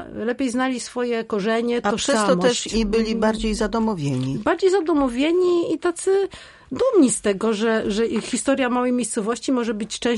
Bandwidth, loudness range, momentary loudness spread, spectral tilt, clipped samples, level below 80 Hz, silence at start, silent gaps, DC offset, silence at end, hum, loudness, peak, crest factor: 11.5 kHz; 1 LU; 6 LU; -4.5 dB/octave; under 0.1%; -44 dBFS; 0 s; none; under 0.1%; 0 s; none; -21 LUFS; -4 dBFS; 16 dB